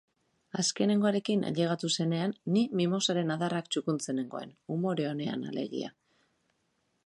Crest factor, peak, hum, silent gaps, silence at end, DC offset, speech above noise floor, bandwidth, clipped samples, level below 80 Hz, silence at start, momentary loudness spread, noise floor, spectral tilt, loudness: 16 dB; -14 dBFS; none; none; 1.15 s; under 0.1%; 46 dB; 11 kHz; under 0.1%; -76 dBFS; 0.55 s; 10 LU; -76 dBFS; -5 dB/octave; -31 LUFS